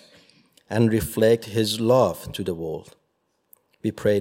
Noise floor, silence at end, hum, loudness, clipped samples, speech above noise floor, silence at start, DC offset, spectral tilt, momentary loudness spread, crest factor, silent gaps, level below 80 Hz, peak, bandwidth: -71 dBFS; 0 s; none; -23 LUFS; under 0.1%; 50 dB; 0.7 s; under 0.1%; -6 dB/octave; 12 LU; 18 dB; none; -50 dBFS; -6 dBFS; 16.5 kHz